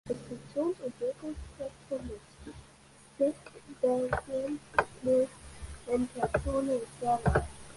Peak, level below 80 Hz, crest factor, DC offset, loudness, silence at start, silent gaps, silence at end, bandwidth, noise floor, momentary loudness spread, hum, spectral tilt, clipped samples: -8 dBFS; -46 dBFS; 26 dB; under 0.1%; -33 LUFS; 0.05 s; none; 0 s; 11.5 kHz; -57 dBFS; 18 LU; none; -6.5 dB/octave; under 0.1%